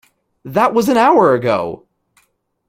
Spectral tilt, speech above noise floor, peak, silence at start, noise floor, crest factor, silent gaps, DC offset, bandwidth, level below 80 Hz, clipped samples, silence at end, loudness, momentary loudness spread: -6 dB/octave; 48 dB; 0 dBFS; 0.45 s; -61 dBFS; 16 dB; none; under 0.1%; 16.5 kHz; -56 dBFS; under 0.1%; 0.9 s; -14 LUFS; 13 LU